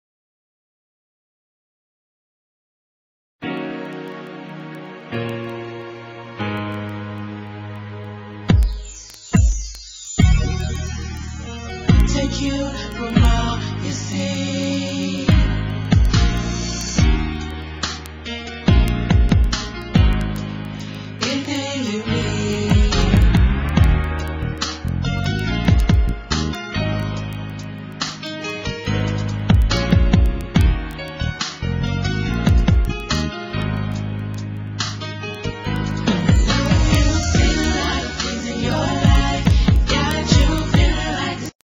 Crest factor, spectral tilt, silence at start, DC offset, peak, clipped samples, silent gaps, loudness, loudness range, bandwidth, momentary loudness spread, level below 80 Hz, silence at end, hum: 18 dB; -5.5 dB/octave; 3.4 s; under 0.1%; -2 dBFS; under 0.1%; none; -20 LUFS; 11 LU; 11.5 kHz; 14 LU; -22 dBFS; 0.15 s; none